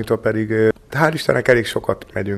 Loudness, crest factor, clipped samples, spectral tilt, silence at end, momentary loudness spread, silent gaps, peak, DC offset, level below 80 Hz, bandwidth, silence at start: -18 LUFS; 18 dB; under 0.1%; -6 dB/octave; 0 s; 8 LU; none; 0 dBFS; under 0.1%; -46 dBFS; 14 kHz; 0 s